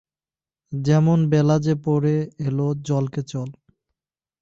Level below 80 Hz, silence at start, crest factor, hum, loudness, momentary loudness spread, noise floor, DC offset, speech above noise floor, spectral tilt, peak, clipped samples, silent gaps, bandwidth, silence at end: -56 dBFS; 0.7 s; 14 dB; none; -21 LUFS; 13 LU; under -90 dBFS; under 0.1%; over 70 dB; -8 dB/octave; -8 dBFS; under 0.1%; none; 7.6 kHz; 0.9 s